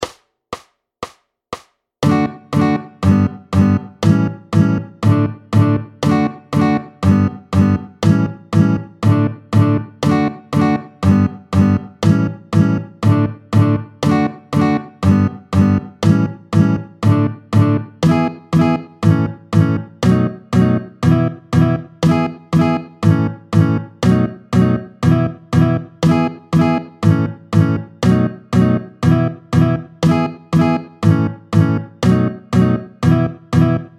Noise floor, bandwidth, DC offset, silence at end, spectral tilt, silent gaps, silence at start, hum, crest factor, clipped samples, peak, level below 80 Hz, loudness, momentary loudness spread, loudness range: -34 dBFS; 11.5 kHz; under 0.1%; 0.1 s; -8 dB/octave; none; 0 s; none; 14 dB; under 0.1%; 0 dBFS; -42 dBFS; -16 LUFS; 3 LU; 0 LU